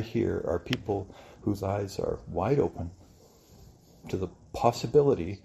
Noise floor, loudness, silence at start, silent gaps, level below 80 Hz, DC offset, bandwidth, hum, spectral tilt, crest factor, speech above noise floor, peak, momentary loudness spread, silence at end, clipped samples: -56 dBFS; -29 LUFS; 0 s; none; -54 dBFS; under 0.1%; 14.5 kHz; none; -7 dB/octave; 22 dB; 27 dB; -8 dBFS; 13 LU; 0.05 s; under 0.1%